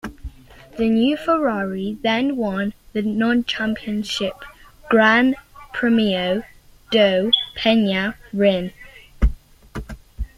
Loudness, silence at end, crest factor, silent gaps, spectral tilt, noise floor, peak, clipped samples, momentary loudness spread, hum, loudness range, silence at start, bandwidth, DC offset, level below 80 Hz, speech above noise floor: -20 LUFS; 0.1 s; 18 dB; none; -5.5 dB/octave; -39 dBFS; -2 dBFS; under 0.1%; 19 LU; none; 3 LU; 0.05 s; 13.5 kHz; under 0.1%; -34 dBFS; 20 dB